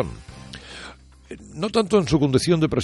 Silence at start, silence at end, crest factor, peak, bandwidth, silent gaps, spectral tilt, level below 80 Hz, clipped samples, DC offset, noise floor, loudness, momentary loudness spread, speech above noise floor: 0 s; 0 s; 18 dB; -4 dBFS; 11.5 kHz; none; -6 dB/octave; -44 dBFS; under 0.1%; under 0.1%; -43 dBFS; -21 LUFS; 22 LU; 23 dB